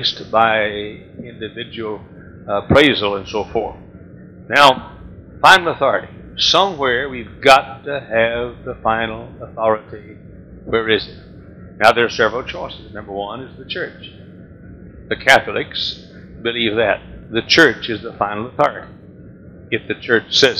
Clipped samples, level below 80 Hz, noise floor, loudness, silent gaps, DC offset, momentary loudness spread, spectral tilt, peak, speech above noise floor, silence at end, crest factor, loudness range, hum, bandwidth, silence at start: 0.3%; -44 dBFS; -39 dBFS; -16 LUFS; none; under 0.1%; 20 LU; -3.5 dB/octave; 0 dBFS; 22 dB; 0 s; 18 dB; 6 LU; none; 16 kHz; 0 s